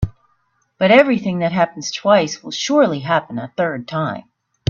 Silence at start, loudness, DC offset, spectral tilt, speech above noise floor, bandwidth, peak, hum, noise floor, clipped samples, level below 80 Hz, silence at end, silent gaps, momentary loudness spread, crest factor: 0 s; -17 LUFS; under 0.1%; -5 dB/octave; 47 dB; 7.6 kHz; 0 dBFS; none; -64 dBFS; under 0.1%; -44 dBFS; 0.5 s; none; 12 LU; 18 dB